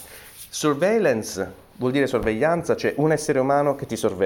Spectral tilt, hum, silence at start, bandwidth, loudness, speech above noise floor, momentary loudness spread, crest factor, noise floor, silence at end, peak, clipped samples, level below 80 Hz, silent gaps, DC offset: -5 dB/octave; none; 0 s; 19 kHz; -22 LUFS; 21 dB; 12 LU; 14 dB; -43 dBFS; 0 s; -8 dBFS; under 0.1%; -50 dBFS; none; under 0.1%